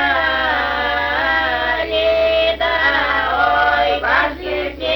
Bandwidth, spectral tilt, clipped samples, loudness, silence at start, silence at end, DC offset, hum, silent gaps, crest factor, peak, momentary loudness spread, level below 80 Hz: over 20 kHz; -5 dB/octave; under 0.1%; -16 LUFS; 0 s; 0 s; under 0.1%; none; none; 14 dB; -2 dBFS; 3 LU; -36 dBFS